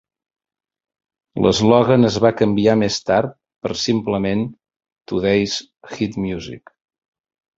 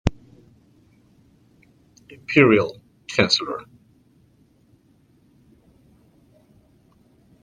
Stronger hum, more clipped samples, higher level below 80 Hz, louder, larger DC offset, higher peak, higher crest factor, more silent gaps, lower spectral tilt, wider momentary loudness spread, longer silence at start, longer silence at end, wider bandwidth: neither; neither; about the same, -48 dBFS vs -46 dBFS; about the same, -18 LUFS vs -19 LUFS; neither; about the same, -2 dBFS vs 0 dBFS; second, 18 dB vs 26 dB; first, 4.76-4.80 s, 4.92-4.96 s vs none; about the same, -5.5 dB/octave vs -5 dB/octave; second, 16 LU vs 21 LU; first, 1.35 s vs 0.05 s; second, 1 s vs 3.8 s; second, 7.8 kHz vs 10 kHz